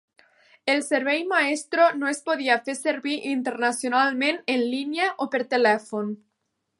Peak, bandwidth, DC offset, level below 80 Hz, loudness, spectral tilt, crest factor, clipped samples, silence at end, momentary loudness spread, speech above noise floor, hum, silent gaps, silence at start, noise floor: -6 dBFS; 11.5 kHz; under 0.1%; -82 dBFS; -24 LUFS; -3 dB/octave; 18 dB; under 0.1%; 0.65 s; 7 LU; 54 dB; none; none; 0.65 s; -77 dBFS